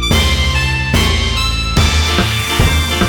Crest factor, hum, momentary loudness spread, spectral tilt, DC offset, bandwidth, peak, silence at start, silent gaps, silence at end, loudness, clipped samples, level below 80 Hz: 12 dB; none; 2 LU; -4 dB/octave; 0.2%; over 20 kHz; -2 dBFS; 0 s; none; 0 s; -13 LUFS; under 0.1%; -18 dBFS